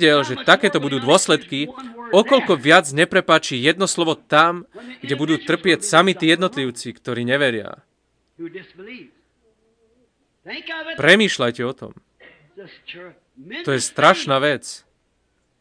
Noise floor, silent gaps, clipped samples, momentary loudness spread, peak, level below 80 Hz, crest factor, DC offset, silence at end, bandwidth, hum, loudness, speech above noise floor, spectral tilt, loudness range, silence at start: -67 dBFS; none; under 0.1%; 23 LU; 0 dBFS; -66 dBFS; 20 dB; under 0.1%; 0.85 s; 10.5 kHz; none; -17 LUFS; 48 dB; -3.5 dB/octave; 10 LU; 0 s